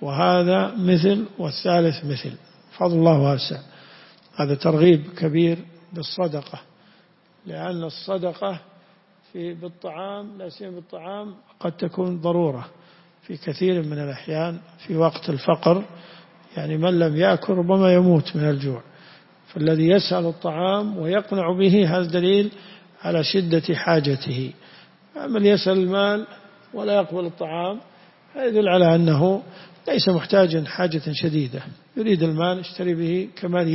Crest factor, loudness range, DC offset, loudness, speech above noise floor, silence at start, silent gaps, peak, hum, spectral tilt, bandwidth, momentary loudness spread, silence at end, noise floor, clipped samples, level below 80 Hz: 18 dB; 10 LU; under 0.1%; -21 LUFS; 36 dB; 0 s; none; -4 dBFS; none; -10 dB/octave; 5.8 kHz; 18 LU; 0 s; -57 dBFS; under 0.1%; -64 dBFS